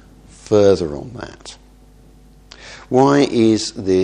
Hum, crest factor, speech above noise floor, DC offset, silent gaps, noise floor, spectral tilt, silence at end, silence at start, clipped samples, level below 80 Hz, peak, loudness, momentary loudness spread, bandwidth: none; 18 dB; 30 dB; under 0.1%; none; -46 dBFS; -6 dB/octave; 0 s; 0.5 s; under 0.1%; -46 dBFS; 0 dBFS; -15 LUFS; 23 LU; 10.5 kHz